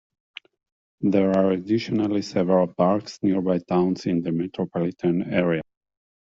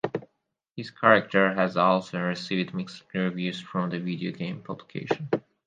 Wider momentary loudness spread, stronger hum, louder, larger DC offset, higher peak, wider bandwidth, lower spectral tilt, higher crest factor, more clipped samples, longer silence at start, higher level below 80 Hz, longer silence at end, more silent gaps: second, 7 LU vs 17 LU; neither; first, -23 LUFS vs -26 LUFS; neither; second, -6 dBFS vs -2 dBFS; second, 7.6 kHz vs 9 kHz; about the same, -7.5 dB/octave vs -6.5 dB/octave; second, 18 dB vs 24 dB; neither; first, 1 s vs 0.05 s; first, -62 dBFS vs -70 dBFS; first, 0.75 s vs 0.3 s; second, none vs 0.71-0.75 s